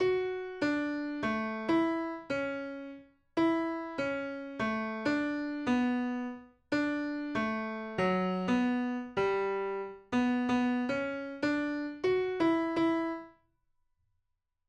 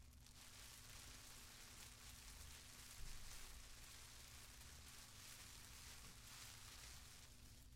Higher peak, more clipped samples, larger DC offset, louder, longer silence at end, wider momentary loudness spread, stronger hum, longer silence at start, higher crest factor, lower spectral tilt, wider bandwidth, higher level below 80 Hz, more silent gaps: first, -18 dBFS vs -40 dBFS; neither; neither; first, -32 LUFS vs -59 LUFS; first, 1.4 s vs 0 s; first, 8 LU vs 3 LU; neither; about the same, 0 s vs 0 s; about the same, 14 dB vs 18 dB; first, -6.5 dB/octave vs -1.5 dB/octave; second, 9.2 kHz vs 16.5 kHz; about the same, -66 dBFS vs -64 dBFS; neither